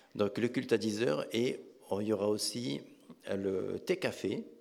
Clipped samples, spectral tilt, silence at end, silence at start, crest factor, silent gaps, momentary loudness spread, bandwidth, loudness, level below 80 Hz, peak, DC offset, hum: under 0.1%; -5 dB/octave; 0.05 s; 0.15 s; 18 dB; none; 8 LU; 16.5 kHz; -34 LUFS; -80 dBFS; -16 dBFS; under 0.1%; none